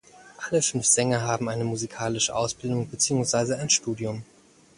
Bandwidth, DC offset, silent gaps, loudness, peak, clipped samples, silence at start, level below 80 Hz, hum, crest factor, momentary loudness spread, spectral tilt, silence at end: 11.5 kHz; under 0.1%; none; -24 LUFS; -6 dBFS; under 0.1%; 0.15 s; -58 dBFS; none; 20 dB; 10 LU; -3.5 dB/octave; 0.55 s